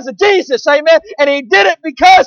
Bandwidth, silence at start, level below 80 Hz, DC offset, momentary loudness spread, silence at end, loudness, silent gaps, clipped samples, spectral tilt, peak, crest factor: 7.4 kHz; 0 s; -48 dBFS; under 0.1%; 4 LU; 0 s; -10 LUFS; none; under 0.1%; -2 dB/octave; 0 dBFS; 10 dB